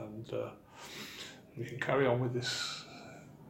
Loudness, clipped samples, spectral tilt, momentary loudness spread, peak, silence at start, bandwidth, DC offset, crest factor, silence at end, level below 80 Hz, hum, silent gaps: -36 LUFS; under 0.1%; -4.5 dB/octave; 19 LU; -16 dBFS; 0 s; 16.5 kHz; under 0.1%; 22 dB; 0 s; -70 dBFS; none; none